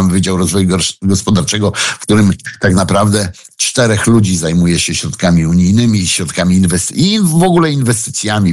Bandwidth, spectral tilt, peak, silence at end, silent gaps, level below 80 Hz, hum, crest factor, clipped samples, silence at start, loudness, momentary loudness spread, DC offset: 12.5 kHz; -4.5 dB/octave; 0 dBFS; 0 s; none; -36 dBFS; none; 10 dB; under 0.1%; 0 s; -12 LUFS; 4 LU; under 0.1%